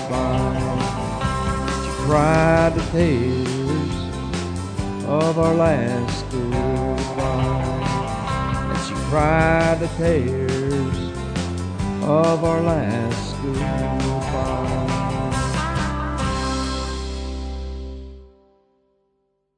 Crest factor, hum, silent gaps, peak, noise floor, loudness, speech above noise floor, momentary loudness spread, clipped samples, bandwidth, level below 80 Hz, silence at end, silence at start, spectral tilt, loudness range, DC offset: 18 dB; none; none; -4 dBFS; -69 dBFS; -21 LUFS; 51 dB; 10 LU; under 0.1%; 10 kHz; -32 dBFS; 1.3 s; 0 s; -6.5 dB/octave; 5 LU; under 0.1%